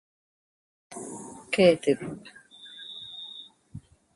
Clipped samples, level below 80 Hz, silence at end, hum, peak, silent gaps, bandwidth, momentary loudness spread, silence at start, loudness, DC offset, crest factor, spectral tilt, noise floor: under 0.1%; -64 dBFS; 0.35 s; none; -8 dBFS; none; 11.5 kHz; 27 LU; 0.9 s; -25 LUFS; under 0.1%; 24 dB; -5 dB/octave; -48 dBFS